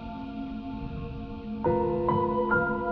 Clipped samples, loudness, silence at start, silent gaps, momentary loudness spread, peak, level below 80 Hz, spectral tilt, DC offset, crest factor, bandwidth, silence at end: under 0.1%; -29 LUFS; 0 s; none; 12 LU; -12 dBFS; -44 dBFS; -7 dB/octave; under 0.1%; 16 dB; 5.6 kHz; 0 s